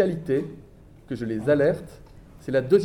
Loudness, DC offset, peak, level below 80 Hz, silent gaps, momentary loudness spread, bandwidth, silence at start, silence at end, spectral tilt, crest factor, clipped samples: -25 LUFS; under 0.1%; -6 dBFS; -52 dBFS; none; 19 LU; 12.5 kHz; 0 s; 0 s; -8 dB/octave; 18 dB; under 0.1%